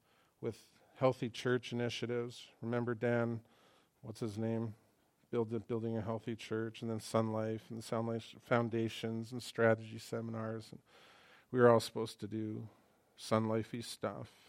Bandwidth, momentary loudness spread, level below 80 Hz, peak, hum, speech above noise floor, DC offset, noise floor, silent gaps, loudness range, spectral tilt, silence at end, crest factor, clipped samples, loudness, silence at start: 15.5 kHz; 13 LU; -78 dBFS; -12 dBFS; none; 32 dB; under 0.1%; -69 dBFS; none; 5 LU; -6 dB/octave; 0.2 s; 24 dB; under 0.1%; -37 LUFS; 0.4 s